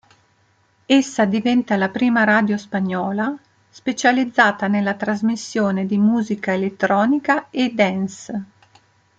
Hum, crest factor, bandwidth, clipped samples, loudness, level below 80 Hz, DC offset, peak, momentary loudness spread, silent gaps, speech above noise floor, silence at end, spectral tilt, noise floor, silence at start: none; 18 dB; 8.8 kHz; under 0.1%; -19 LUFS; -64 dBFS; under 0.1%; -2 dBFS; 10 LU; none; 42 dB; 0.75 s; -5.5 dB/octave; -60 dBFS; 0.9 s